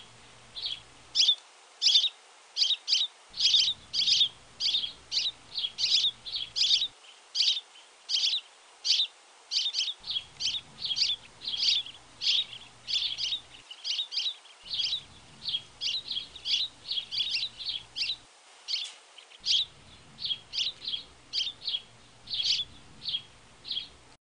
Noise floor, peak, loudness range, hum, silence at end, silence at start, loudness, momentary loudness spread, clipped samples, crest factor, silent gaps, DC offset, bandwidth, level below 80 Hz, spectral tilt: -55 dBFS; -10 dBFS; 7 LU; none; 0.4 s; 0 s; -28 LUFS; 12 LU; under 0.1%; 22 dB; none; under 0.1%; 10.5 kHz; -68 dBFS; 2 dB/octave